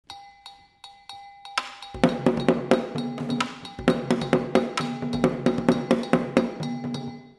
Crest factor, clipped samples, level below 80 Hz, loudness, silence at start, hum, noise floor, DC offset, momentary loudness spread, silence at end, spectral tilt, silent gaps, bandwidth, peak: 26 dB; under 0.1%; -52 dBFS; -25 LUFS; 0.1 s; none; -50 dBFS; under 0.1%; 20 LU; 0.05 s; -6 dB/octave; none; 12 kHz; 0 dBFS